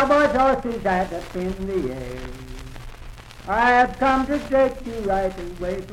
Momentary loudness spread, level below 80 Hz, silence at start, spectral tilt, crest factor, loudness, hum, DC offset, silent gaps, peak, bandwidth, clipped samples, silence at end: 21 LU; -38 dBFS; 0 s; -6 dB/octave; 16 dB; -21 LUFS; none; under 0.1%; none; -6 dBFS; 15.5 kHz; under 0.1%; 0 s